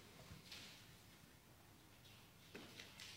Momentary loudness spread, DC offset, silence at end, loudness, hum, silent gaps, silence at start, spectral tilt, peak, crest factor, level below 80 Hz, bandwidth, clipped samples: 10 LU; under 0.1%; 0 s; -60 LUFS; none; none; 0 s; -3 dB/octave; -36 dBFS; 24 dB; -76 dBFS; 16 kHz; under 0.1%